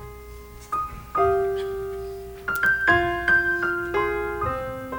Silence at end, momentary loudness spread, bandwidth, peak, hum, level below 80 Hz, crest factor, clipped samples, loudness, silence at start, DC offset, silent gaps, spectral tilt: 0 s; 15 LU; over 20 kHz; -6 dBFS; 60 Hz at -45 dBFS; -42 dBFS; 18 dB; under 0.1%; -23 LUFS; 0 s; under 0.1%; none; -5.5 dB/octave